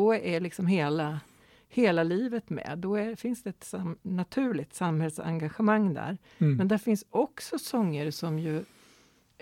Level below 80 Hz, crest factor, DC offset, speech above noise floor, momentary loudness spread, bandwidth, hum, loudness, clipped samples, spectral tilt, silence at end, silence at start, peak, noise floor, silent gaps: -68 dBFS; 16 dB; under 0.1%; 33 dB; 11 LU; 16.5 kHz; none; -30 LUFS; under 0.1%; -7 dB/octave; 0.75 s; 0 s; -12 dBFS; -62 dBFS; none